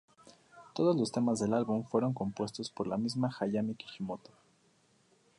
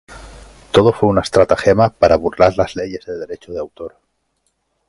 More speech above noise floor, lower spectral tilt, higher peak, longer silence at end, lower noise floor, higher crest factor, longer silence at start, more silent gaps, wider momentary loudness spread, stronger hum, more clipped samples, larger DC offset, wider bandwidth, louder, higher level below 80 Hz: second, 36 dB vs 52 dB; about the same, -6.5 dB/octave vs -6 dB/octave; second, -16 dBFS vs 0 dBFS; first, 1.2 s vs 1 s; about the same, -69 dBFS vs -67 dBFS; about the same, 18 dB vs 16 dB; first, 0.55 s vs 0.1 s; neither; second, 11 LU vs 15 LU; neither; neither; neither; about the same, 11 kHz vs 11.5 kHz; second, -33 LUFS vs -14 LUFS; second, -70 dBFS vs -40 dBFS